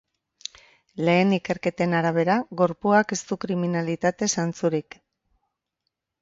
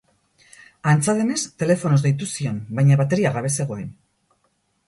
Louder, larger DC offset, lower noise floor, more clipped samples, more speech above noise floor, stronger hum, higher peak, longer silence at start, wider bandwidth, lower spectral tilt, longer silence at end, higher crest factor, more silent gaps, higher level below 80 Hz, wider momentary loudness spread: about the same, -23 LUFS vs -21 LUFS; neither; first, -81 dBFS vs -68 dBFS; neither; first, 58 dB vs 48 dB; neither; about the same, -6 dBFS vs -4 dBFS; about the same, 0.95 s vs 0.85 s; second, 7.8 kHz vs 11.5 kHz; about the same, -5 dB/octave vs -6 dB/octave; first, 1.4 s vs 0.95 s; about the same, 20 dB vs 18 dB; neither; second, -64 dBFS vs -58 dBFS; first, 14 LU vs 9 LU